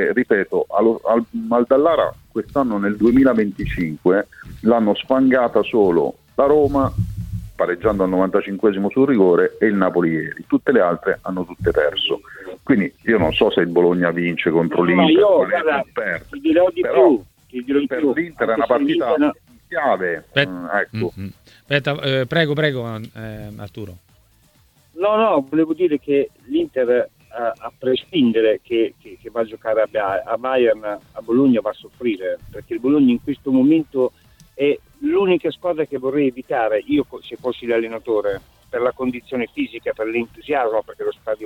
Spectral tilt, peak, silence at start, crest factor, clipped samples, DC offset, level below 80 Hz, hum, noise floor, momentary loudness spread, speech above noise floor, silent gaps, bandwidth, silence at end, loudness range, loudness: -7.5 dB/octave; 0 dBFS; 0 s; 18 dB; under 0.1%; under 0.1%; -44 dBFS; none; -55 dBFS; 12 LU; 37 dB; none; 16 kHz; 0 s; 6 LU; -19 LUFS